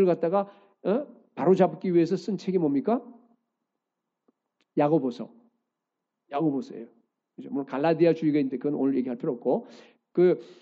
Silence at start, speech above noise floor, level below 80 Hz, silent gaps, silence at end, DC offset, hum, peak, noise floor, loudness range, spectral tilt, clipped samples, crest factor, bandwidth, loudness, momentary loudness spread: 0 s; 59 dB; -80 dBFS; none; 0.1 s; under 0.1%; none; -8 dBFS; -85 dBFS; 5 LU; -8.5 dB/octave; under 0.1%; 20 dB; 7.6 kHz; -26 LUFS; 13 LU